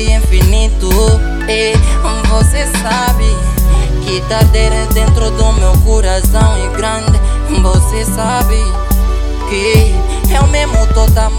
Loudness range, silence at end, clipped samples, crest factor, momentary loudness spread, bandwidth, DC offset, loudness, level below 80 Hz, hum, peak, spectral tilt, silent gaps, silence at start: 1 LU; 0 s; under 0.1%; 10 dB; 4 LU; 17 kHz; under 0.1%; -12 LUFS; -10 dBFS; none; 0 dBFS; -5 dB/octave; none; 0 s